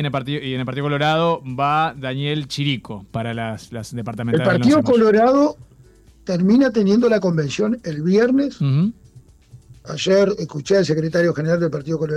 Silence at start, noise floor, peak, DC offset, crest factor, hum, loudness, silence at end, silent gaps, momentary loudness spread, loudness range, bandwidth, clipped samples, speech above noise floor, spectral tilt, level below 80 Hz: 0 s; -49 dBFS; -8 dBFS; under 0.1%; 12 dB; none; -19 LUFS; 0 s; none; 12 LU; 5 LU; 12 kHz; under 0.1%; 30 dB; -6.5 dB/octave; -52 dBFS